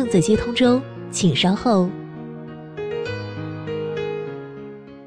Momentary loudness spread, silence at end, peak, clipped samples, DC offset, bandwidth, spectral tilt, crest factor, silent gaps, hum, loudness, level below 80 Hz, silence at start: 17 LU; 0 s; -6 dBFS; under 0.1%; under 0.1%; 10.5 kHz; -5.5 dB/octave; 16 dB; none; none; -21 LUFS; -46 dBFS; 0 s